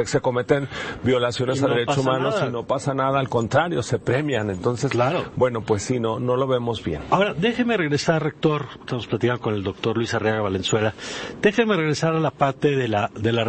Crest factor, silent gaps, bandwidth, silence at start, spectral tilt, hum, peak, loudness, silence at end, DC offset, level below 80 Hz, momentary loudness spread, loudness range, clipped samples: 16 dB; none; 8.8 kHz; 0 s; -5.5 dB/octave; none; -6 dBFS; -22 LUFS; 0 s; under 0.1%; -52 dBFS; 4 LU; 1 LU; under 0.1%